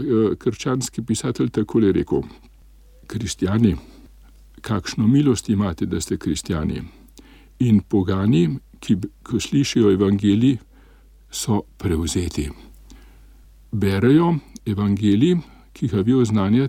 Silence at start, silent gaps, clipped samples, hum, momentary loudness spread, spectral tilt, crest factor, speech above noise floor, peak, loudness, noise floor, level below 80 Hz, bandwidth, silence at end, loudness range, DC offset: 0 s; none; under 0.1%; none; 11 LU; -6.5 dB/octave; 18 dB; 29 dB; -4 dBFS; -20 LUFS; -49 dBFS; -42 dBFS; 16 kHz; 0 s; 4 LU; under 0.1%